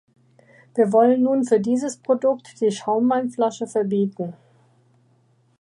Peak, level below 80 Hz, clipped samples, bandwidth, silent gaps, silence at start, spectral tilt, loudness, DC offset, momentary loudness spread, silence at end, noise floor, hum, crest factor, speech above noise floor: -4 dBFS; -74 dBFS; under 0.1%; 11 kHz; none; 0.75 s; -6.5 dB/octave; -21 LUFS; under 0.1%; 9 LU; 1.3 s; -61 dBFS; none; 16 dB; 41 dB